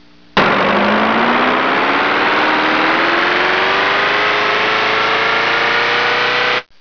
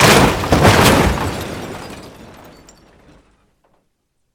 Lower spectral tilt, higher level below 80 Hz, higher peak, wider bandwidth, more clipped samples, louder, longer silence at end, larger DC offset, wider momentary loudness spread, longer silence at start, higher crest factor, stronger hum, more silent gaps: about the same, -4 dB/octave vs -4.5 dB/octave; second, -50 dBFS vs -30 dBFS; second, -6 dBFS vs 0 dBFS; second, 5.4 kHz vs over 20 kHz; neither; about the same, -13 LUFS vs -13 LUFS; second, 0.2 s vs 2.25 s; first, 0.4% vs under 0.1%; second, 1 LU vs 22 LU; first, 0.35 s vs 0 s; second, 8 dB vs 16 dB; neither; neither